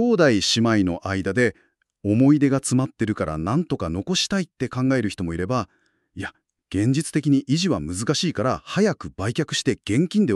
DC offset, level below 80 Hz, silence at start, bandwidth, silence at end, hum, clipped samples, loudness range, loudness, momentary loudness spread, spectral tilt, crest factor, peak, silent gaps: under 0.1%; -50 dBFS; 0 s; 12.5 kHz; 0 s; none; under 0.1%; 4 LU; -22 LUFS; 10 LU; -5 dB/octave; 18 dB; -4 dBFS; none